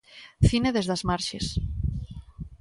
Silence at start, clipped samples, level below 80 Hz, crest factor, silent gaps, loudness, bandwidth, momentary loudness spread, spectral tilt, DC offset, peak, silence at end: 0.1 s; under 0.1%; -36 dBFS; 20 dB; none; -27 LUFS; 11.5 kHz; 19 LU; -5.5 dB/octave; under 0.1%; -8 dBFS; 0.05 s